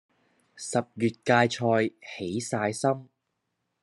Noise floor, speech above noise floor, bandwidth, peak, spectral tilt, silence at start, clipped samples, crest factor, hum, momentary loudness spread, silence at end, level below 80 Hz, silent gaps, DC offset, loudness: -80 dBFS; 53 dB; 12 kHz; -6 dBFS; -5 dB/octave; 0.55 s; under 0.1%; 22 dB; none; 11 LU; 0.8 s; -72 dBFS; none; under 0.1%; -27 LUFS